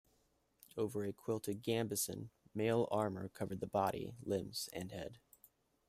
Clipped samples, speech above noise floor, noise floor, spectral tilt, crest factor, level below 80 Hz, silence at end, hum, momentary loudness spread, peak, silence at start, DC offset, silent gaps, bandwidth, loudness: under 0.1%; 38 dB; -77 dBFS; -5 dB/octave; 20 dB; -72 dBFS; 0.7 s; none; 12 LU; -22 dBFS; 0.75 s; under 0.1%; none; 16 kHz; -40 LUFS